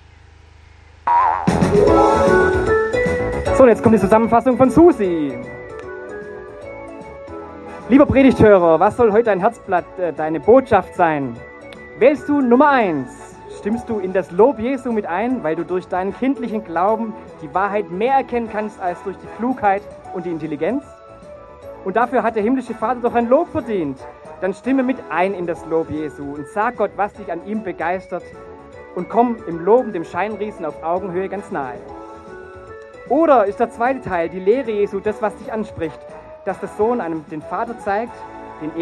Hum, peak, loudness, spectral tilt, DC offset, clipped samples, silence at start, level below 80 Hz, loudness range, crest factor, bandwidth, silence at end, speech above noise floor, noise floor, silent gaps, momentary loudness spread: none; 0 dBFS; -18 LUFS; -7.5 dB/octave; under 0.1%; under 0.1%; 1.05 s; -42 dBFS; 9 LU; 18 dB; 12 kHz; 0 s; 28 dB; -45 dBFS; none; 21 LU